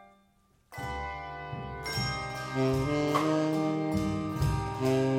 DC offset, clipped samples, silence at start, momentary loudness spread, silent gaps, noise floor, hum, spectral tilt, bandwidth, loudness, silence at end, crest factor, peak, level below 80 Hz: under 0.1%; under 0.1%; 0 s; 11 LU; none; -67 dBFS; none; -6 dB/octave; 16.5 kHz; -31 LUFS; 0 s; 16 dB; -14 dBFS; -46 dBFS